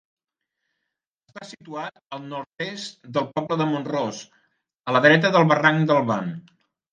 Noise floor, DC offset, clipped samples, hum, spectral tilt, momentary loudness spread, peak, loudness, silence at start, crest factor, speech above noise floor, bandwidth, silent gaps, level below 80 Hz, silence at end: -82 dBFS; under 0.1%; under 0.1%; none; -6 dB/octave; 21 LU; -2 dBFS; -21 LUFS; 1.35 s; 22 dB; 60 dB; 9.2 kHz; none; -72 dBFS; 0.55 s